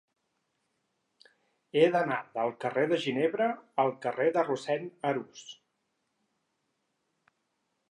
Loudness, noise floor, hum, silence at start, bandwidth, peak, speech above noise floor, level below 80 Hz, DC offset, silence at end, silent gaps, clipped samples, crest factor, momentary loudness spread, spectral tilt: -30 LUFS; -79 dBFS; none; 1.75 s; 10 kHz; -12 dBFS; 50 dB; -86 dBFS; under 0.1%; 2.4 s; none; under 0.1%; 22 dB; 9 LU; -5.5 dB/octave